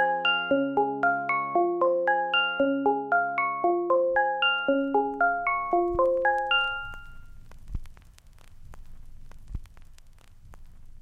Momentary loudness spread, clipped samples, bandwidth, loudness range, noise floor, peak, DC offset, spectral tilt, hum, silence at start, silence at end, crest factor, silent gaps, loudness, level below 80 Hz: 19 LU; under 0.1%; 7.2 kHz; 6 LU; -51 dBFS; -12 dBFS; under 0.1%; -6 dB/octave; none; 0 s; 0 s; 14 dB; none; -25 LUFS; -46 dBFS